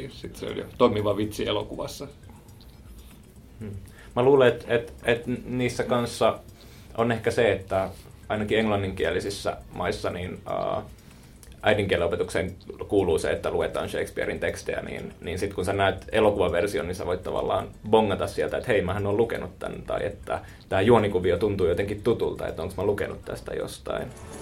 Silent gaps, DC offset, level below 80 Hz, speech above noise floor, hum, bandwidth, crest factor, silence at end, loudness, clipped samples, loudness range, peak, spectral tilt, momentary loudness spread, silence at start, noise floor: none; under 0.1%; -46 dBFS; 22 dB; none; 16.5 kHz; 22 dB; 0 s; -26 LUFS; under 0.1%; 4 LU; -4 dBFS; -5.5 dB/octave; 12 LU; 0 s; -48 dBFS